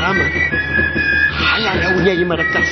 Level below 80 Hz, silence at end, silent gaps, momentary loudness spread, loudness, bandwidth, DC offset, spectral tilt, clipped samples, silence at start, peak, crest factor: -30 dBFS; 0 s; none; 2 LU; -14 LUFS; 6.4 kHz; under 0.1%; -5 dB/octave; under 0.1%; 0 s; -2 dBFS; 14 dB